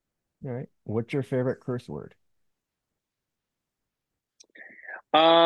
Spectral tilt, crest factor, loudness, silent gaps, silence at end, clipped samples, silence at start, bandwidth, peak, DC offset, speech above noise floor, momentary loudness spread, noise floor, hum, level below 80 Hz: -6.5 dB/octave; 22 dB; -27 LUFS; none; 0 s; under 0.1%; 0.4 s; 10.5 kHz; -8 dBFS; under 0.1%; 61 dB; 23 LU; -86 dBFS; none; -70 dBFS